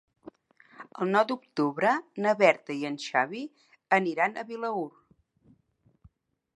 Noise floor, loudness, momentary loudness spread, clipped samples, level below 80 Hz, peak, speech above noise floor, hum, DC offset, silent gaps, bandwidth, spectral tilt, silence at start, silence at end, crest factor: -68 dBFS; -27 LUFS; 12 LU; under 0.1%; -76 dBFS; -6 dBFS; 41 dB; none; under 0.1%; none; 11 kHz; -5.5 dB/octave; 0.25 s; 1.65 s; 24 dB